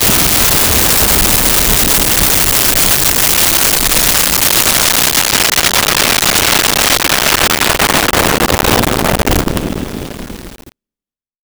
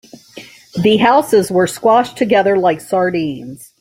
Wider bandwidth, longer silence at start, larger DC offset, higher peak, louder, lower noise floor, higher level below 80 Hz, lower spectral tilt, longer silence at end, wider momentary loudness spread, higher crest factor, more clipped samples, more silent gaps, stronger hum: first, over 20 kHz vs 16.5 kHz; second, 0 s vs 0.35 s; neither; about the same, 0 dBFS vs -2 dBFS; first, -8 LUFS vs -14 LUFS; first, under -90 dBFS vs -38 dBFS; first, -24 dBFS vs -54 dBFS; second, -1.5 dB/octave vs -5 dB/octave; first, 0.8 s vs 0.15 s; second, 6 LU vs 12 LU; about the same, 12 dB vs 14 dB; neither; neither; neither